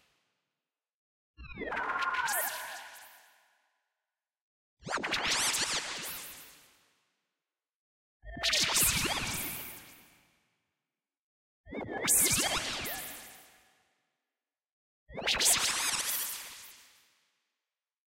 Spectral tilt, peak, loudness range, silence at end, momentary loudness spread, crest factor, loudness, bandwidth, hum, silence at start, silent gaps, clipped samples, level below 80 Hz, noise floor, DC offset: -0.5 dB/octave; -14 dBFS; 5 LU; 1.35 s; 23 LU; 22 dB; -29 LUFS; 16 kHz; none; 1.4 s; 4.41-4.77 s, 7.75-8.20 s, 11.19-11.64 s, 14.72-15.06 s; under 0.1%; -58 dBFS; under -90 dBFS; under 0.1%